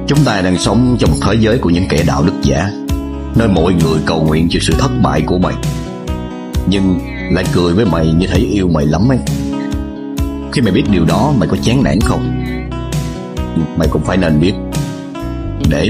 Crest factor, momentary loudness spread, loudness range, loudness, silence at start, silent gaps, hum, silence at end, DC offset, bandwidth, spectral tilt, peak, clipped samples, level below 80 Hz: 12 dB; 9 LU; 2 LU; -14 LUFS; 0 s; none; none; 0 s; 0.2%; 16 kHz; -6.5 dB/octave; 0 dBFS; under 0.1%; -24 dBFS